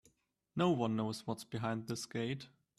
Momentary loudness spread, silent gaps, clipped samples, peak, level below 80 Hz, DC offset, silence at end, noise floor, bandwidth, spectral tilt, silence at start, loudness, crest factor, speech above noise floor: 9 LU; none; under 0.1%; -20 dBFS; -74 dBFS; under 0.1%; 0.3 s; -75 dBFS; 13.5 kHz; -6 dB/octave; 0.55 s; -38 LUFS; 18 dB; 38 dB